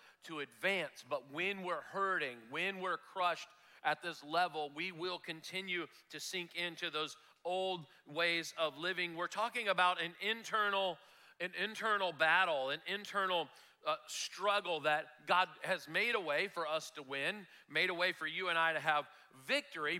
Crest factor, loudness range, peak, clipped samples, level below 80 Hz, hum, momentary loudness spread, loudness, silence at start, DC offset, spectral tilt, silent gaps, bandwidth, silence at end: 20 dB; 5 LU; -18 dBFS; under 0.1%; under -90 dBFS; none; 11 LU; -37 LUFS; 0.25 s; under 0.1%; -2.5 dB/octave; none; 16.5 kHz; 0 s